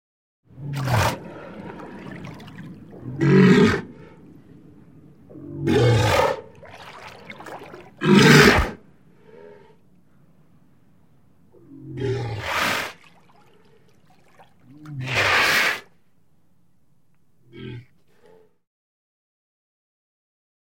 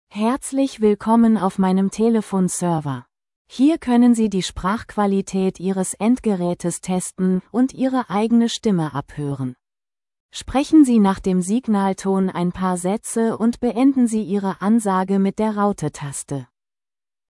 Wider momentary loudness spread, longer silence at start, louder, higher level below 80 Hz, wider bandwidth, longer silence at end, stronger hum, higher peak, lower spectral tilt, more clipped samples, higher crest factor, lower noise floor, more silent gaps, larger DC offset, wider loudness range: first, 26 LU vs 11 LU; first, 0.6 s vs 0.15 s; about the same, -19 LUFS vs -19 LUFS; about the same, -44 dBFS vs -48 dBFS; first, 16.5 kHz vs 12 kHz; first, 2.85 s vs 0.85 s; neither; first, 0 dBFS vs -4 dBFS; about the same, -5 dB/octave vs -6 dB/octave; neither; first, 24 dB vs 16 dB; second, -66 dBFS vs under -90 dBFS; second, none vs 3.36-3.45 s, 10.20-10.29 s; first, 0.2% vs under 0.1%; first, 10 LU vs 3 LU